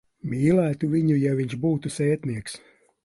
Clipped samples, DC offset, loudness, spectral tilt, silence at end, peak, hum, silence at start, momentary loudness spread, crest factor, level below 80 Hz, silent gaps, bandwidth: under 0.1%; under 0.1%; -24 LUFS; -7.5 dB/octave; 0.5 s; -8 dBFS; none; 0.25 s; 12 LU; 16 dB; -56 dBFS; none; 11.5 kHz